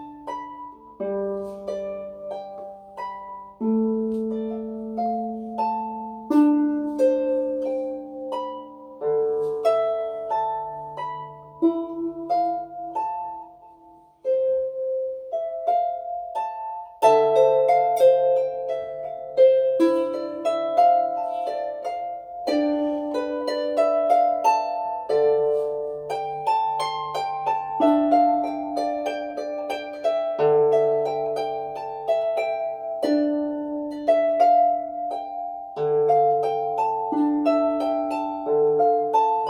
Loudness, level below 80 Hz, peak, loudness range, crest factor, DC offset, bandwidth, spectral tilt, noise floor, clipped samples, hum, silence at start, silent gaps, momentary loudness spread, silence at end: -23 LUFS; -64 dBFS; -4 dBFS; 7 LU; 18 dB; under 0.1%; 12.5 kHz; -6 dB/octave; -51 dBFS; under 0.1%; none; 0 s; none; 14 LU; 0 s